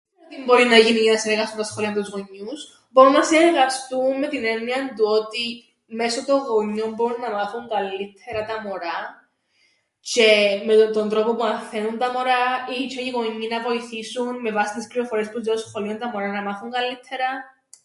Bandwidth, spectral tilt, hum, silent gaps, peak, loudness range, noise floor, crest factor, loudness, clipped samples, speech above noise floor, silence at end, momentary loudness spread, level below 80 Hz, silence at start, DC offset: 11.5 kHz; -3 dB/octave; none; none; 0 dBFS; 7 LU; -64 dBFS; 20 dB; -21 LUFS; under 0.1%; 43 dB; 0.4 s; 15 LU; -66 dBFS; 0.3 s; under 0.1%